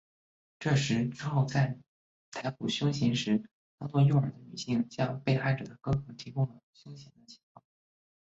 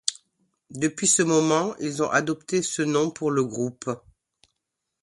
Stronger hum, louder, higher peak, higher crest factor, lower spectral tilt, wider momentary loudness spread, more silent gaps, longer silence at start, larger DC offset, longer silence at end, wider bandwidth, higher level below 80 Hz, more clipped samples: neither; second, -31 LUFS vs -24 LUFS; second, -14 dBFS vs 0 dBFS; second, 16 dB vs 24 dB; first, -6.5 dB/octave vs -3.5 dB/octave; first, 16 LU vs 11 LU; first, 1.88-2.32 s, 3.51-3.78 s, 6.63-6.73 s vs none; first, 0.6 s vs 0.05 s; neither; about the same, 0.95 s vs 1.05 s; second, 8 kHz vs 12 kHz; about the same, -62 dBFS vs -66 dBFS; neither